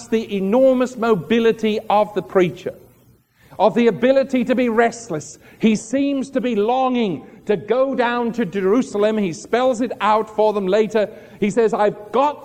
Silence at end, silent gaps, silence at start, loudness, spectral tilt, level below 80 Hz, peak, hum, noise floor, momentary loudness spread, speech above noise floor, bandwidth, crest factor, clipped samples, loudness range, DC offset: 0 s; none; 0 s; -19 LUFS; -6 dB/octave; -58 dBFS; -2 dBFS; none; -54 dBFS; 7 LU; 36 dB; 15 kHz; 16 dB; under 0.1%; 1 LU; under 0.1%